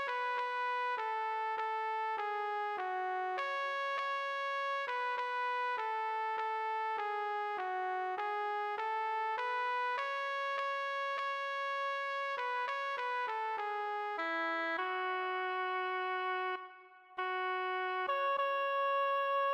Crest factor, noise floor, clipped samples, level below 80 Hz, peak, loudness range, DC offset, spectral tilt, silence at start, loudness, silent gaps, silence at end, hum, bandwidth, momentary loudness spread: 12 dB; -57 dBFS; under 0.1%; under -90 dBFS; -24 dBFS; 1 LU; under 0.1%; -1 dB/octave; 0 s; -36 LUFS; none; 0 s; none; 16 kHz; 4 LU